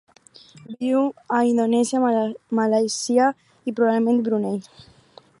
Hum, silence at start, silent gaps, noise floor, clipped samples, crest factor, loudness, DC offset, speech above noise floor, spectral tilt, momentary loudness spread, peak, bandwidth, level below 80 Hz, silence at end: none; 0.55 s; none; -51 dBFS; under 0.1%; 16 dB; -21 LUFS; under 0.1%; 31 dB; -5 dB/octave; 10 LU; -6 dBFS; 11.5 kHz; -72 dBFS; 0.8 s